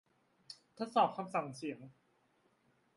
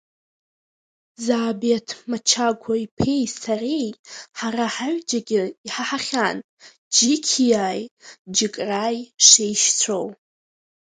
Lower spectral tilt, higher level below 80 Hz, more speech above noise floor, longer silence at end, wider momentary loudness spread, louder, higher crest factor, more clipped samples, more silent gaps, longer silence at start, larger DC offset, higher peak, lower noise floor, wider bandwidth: first, -5.5 dB/octave vs -2 dB/octave; second, -84 dBFS vs -58 dBFS; second, 38 dB vs over 68 dB; first, 1.05 s vs 0.7 s; first, 22 LU vs 14 LU; second, -37 LUFS vs -20 LUFS; about the same, 24 dB vs 22 dB; neither; second, none vs 2.91-2.97 s, 3.99-4.04 s, 5.57-5.64 s, 6.44-6.57 s, 6.78-6.91 s, 7.91-7.97 s, 8.19-8.25 s; second, 0.5 s vs 1.2 s; neither; second, -16 dBFS vs 0 dBFS; second, -75 dBFS vs under -90 dBFS; first, 11.5 kHz vs 10 kHz